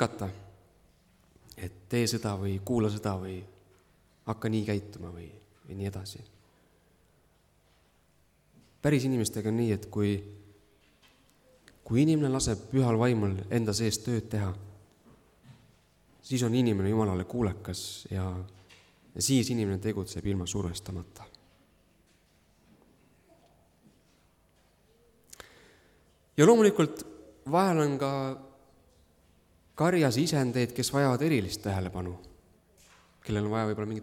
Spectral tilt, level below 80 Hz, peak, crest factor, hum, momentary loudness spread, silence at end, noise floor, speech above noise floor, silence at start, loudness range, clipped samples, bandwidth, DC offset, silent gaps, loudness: -5.5 dB/octave; -58 dBFS; -8 dBFS; 22 dB; none; 19 LU; 0 s; -67 dBFS; 38 dB; 0 s; 10 LU; under 0.1%; 17 kHz; under 0.1%; none; -29 LUFS